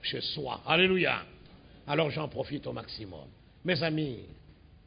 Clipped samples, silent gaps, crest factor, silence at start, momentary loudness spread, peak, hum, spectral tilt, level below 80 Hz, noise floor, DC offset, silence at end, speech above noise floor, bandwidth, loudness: under 0.1%; none; 22 dB; 0 s; 20 LU; -10 dBFS; none; -9 dB/octave; -58 dBFS; -54 dBFS; under 0.1%; 0.1 s; 23 dB; 5.2 kHz; -30 LUFS